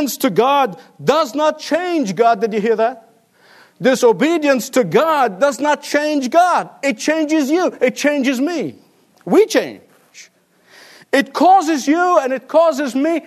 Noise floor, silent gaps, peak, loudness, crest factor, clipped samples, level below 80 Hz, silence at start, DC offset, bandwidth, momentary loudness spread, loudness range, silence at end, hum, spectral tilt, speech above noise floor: -52 dBFS; none; 0 dBFS; -16 LUFS; 16 dB; under 0.1%; -70 dBFS; 0 s; under 0.1%; 13.5 kHz; 6 LU; 3 LU; 0.05 s; none; -4 dB/octave; 37 dB